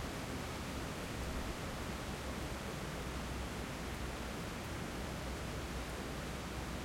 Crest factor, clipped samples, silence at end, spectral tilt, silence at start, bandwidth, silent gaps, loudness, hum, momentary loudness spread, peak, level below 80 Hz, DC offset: 12 dB; under 0.1%; 0 s; -4.5 dB/octave; 0 s; 16.5 kHz; none; -43 LUFS; none; 1 LU; -30 dBFS; -48 dBFS; under 0.1%